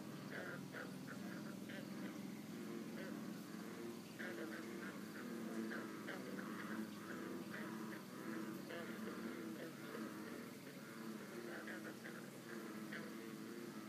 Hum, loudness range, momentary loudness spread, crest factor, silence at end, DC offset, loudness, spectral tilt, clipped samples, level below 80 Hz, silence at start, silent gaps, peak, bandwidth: none; 2 LU; 4 LU; 16 dB; 0 s; under 0.1%; -50 LUFS; -5 dB/octave; under 0.1%; under -90 dBFS; 0 s; none; -34 dBFS; 15.5 kHz